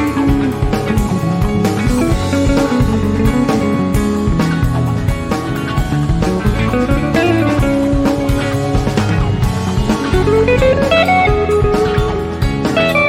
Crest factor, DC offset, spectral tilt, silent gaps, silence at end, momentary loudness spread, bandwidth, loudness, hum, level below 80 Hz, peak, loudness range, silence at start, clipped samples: 12 dB; under 0.1%; -6.5 dB/octave; none; 0 s; 5 LU; 16.5 kHz; -14 LUFS; none; -22 dBFS; -2 dBFS; 2 LU; 0 s; under 0.1%